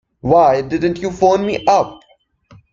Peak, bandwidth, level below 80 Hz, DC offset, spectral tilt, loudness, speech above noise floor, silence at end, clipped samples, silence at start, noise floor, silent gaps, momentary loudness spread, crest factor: -2 dBFS; 7.6 kHz; -46 dBFS; under 0.1%; -6 dB/octave; -15 LUFS; 41 dB; 0.8 s; under 0.1%; 0.25 s; -55 dBFS; none; 7 LU; 14 dB